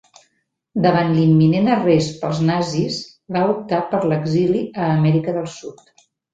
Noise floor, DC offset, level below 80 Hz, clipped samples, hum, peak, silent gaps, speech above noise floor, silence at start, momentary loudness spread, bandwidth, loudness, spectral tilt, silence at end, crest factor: -69 dBFS; under 0.1%; -56 dBFS; under 0.1%; none; -2 dBFS; none; 51 dB; 0.75 s; 11 LU; 7.8 kHz; -18 LUFS; -7 dB/octave; 0.6 s; 16 dB